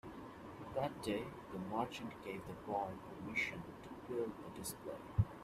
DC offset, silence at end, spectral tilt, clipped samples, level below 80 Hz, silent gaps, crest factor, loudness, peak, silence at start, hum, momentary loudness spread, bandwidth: under 0.1%; 0 s; -5.5 dB/octave; under 0.1%; -60 dBFS; none; 22 dB; -44 LUFS; -22 dBFS; 0.05 s; none; 12 LU; 15 kHz